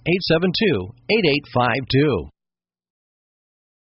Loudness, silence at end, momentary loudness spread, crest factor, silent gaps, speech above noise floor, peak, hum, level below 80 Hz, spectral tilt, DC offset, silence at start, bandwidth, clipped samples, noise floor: -19 LUFS; 1.6 s; 4 LU; 16 dB; none; 70 dB; -6 dBFS; none; -48 dBFS; -4 dB/octave; under 0.1%; 0.05 s; 6 kHz; under 0.1%; -90 dBFS